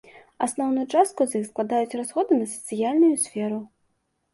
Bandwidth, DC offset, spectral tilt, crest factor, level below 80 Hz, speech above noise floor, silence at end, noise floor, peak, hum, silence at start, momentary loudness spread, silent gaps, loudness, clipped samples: 12 kHz; under 0.1%; -4.5 dB/octave; 18 dB; -70 dBFS; 49 dB; 0.7 s; -72 dBFS; -8 dBFS; none; 0.4 s; 9 LU; none; -24 LUFS; under 0.1%